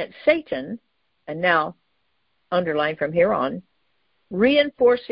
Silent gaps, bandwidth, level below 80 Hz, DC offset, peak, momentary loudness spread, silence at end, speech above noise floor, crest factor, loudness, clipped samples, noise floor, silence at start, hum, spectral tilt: none; 5.4 kHz; -58 dBFS; under 0.1%; -4 dBFS; 16 LU; 0.05 s; 51 dB; 20 dB; -21 LUFS; under 0.1%; -72 dBFS; 0 s; none; -10 dB/octave